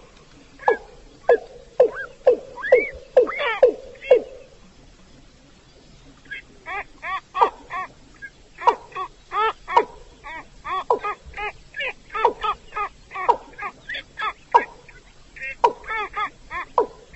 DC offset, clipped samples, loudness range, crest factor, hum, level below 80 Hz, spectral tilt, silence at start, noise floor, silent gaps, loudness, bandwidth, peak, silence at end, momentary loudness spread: under 0.1%; under 0.1%; 8 LU; 22 dB; none; -50 dBFS; -4 dB/octave; 0.6 s; -50 dBFS; none; -23 LUFS; 8.2 kHz; -2 dBFS; 0.25 s; 16 LU